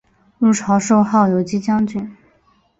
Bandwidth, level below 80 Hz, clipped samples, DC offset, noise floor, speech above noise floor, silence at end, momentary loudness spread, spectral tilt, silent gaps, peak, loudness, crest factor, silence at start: 8 kHz; -54 dBFS; under 0.1%; under 0.1%; -58 dBFS; 42 dB; 0.65 s; 9 LU; -6.5 dB/octave; none; -2 dBFS; -16 LUFS; 16 dB; 0.4 s